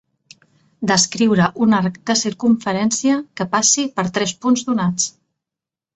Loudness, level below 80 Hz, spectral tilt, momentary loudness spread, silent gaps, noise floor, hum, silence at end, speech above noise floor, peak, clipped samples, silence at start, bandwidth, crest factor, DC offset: -17 LUFS; -58 dBFS; -3.5 dB/octave; 6 LU; none; -87 dBFS; none; 0.85 s; 70 dB; -2 dBFS; under 0.1%; 0.8 s; 8.4 kHz; 16 dB; under 0.1%